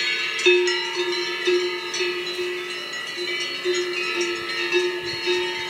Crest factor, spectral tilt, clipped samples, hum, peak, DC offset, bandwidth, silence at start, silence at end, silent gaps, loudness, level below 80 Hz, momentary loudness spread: 20 dB; -1.5 dB/octave; under 0.1%; none; -4 dBFS; under 0.1%; 15.5 kHz; 0 s; 0 s; none; -23 LUFS; -68 dBFS; 8 LU